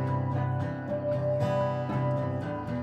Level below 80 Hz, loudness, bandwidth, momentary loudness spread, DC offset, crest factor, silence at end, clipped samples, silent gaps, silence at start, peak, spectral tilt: -58 dBFS; -30 LUFS; 7.8 kHz; 5 LU; under 0.1%; 12 dB; 0 s; under 0.1%; none; 0 s; -18 dBFS; -9 dB/octave